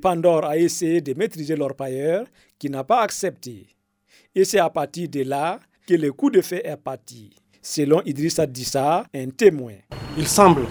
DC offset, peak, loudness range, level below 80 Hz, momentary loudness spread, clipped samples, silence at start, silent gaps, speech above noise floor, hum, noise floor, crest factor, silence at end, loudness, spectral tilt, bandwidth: under 0.1%; 0 dBFS; 2 LU; -52 dBFS; 15 LU; under 0.1%; 0 s; none; 38 dB; none; -59 dBFS; 22 dB; 0 s; -21 LUFS; -5 dB/octave; over 20 kHz